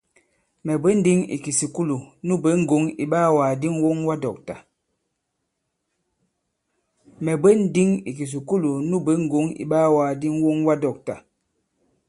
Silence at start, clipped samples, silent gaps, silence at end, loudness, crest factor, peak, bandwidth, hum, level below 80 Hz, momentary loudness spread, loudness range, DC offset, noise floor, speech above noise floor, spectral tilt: 0.65 s; under 0.1%; none; 0.9 s; -21 LUFS; 18 dB; -4 dBFS; 11.5 kHz; none; -62 dBFS; 12 LU; 7 LU; under 0.1%; -77 dBFS; 56 dB; -6.5 dB/octave